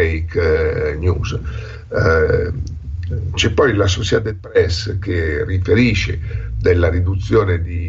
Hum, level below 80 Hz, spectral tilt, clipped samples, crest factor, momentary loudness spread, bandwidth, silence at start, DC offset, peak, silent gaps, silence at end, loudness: none; -28 dBFS; -5.5 dB/octave; under 0.1%; 14 dB; 10 LU; 7.6 kHz; 0 s; under 0.1%; -2 dBFS; none; 0 s; -17 LUFS